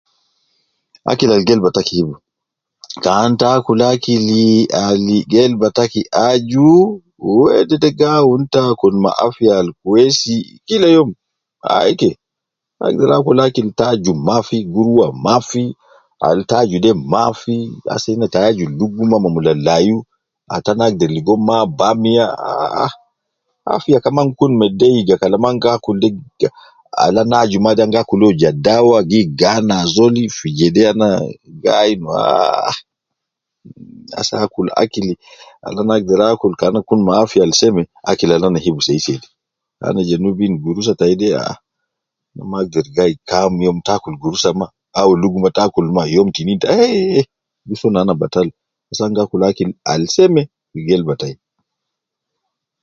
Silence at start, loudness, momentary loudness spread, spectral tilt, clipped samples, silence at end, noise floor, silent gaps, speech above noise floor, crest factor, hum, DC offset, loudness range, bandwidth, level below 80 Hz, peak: 1.05 s; -14 LUFS; 9 LU; -5.5 dB/octave; under 0.1%; 1.5 s; -81 dBFS; none; 67 dB; 14 dB; none; under 0.1%; 5 LU; 7.6 kHz; -48 dBFS; 0 dBFS